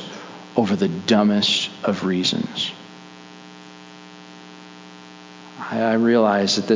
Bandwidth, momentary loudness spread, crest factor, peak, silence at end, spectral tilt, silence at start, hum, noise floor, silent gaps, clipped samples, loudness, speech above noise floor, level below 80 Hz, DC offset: 7.6 kHz; 24 LU; 20 dB; -2 dBFS; 0 s; -4.5 dB/octave; 0 s; none; -42 dBFS; none; under 0.1%; -20 LUFS; 23 dB; -62 dBFS; under 0.1%